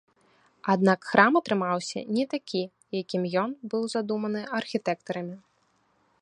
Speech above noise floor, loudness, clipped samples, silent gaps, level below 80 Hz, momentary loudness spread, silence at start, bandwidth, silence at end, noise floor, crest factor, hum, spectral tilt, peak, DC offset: 42 dB; -27 LUFS; under 0.1%; none; -74 dBFS; 14 LU; 0.65 s; 10.5 kHz; 0.85 s; -68 dBFS; 26 dB; none; -5.5 dB/octave; -2 dBFS; under 0.1%